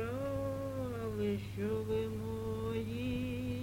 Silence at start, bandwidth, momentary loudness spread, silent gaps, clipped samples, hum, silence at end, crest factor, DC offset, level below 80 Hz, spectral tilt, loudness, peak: 0 s; 17 kHz; 3 LU; none; under 0.1%; none; 0 s; 14 dB; under 0.1%; -52 dBFS; -7.5 dB/octave; -38 LUFS; -24 dBFS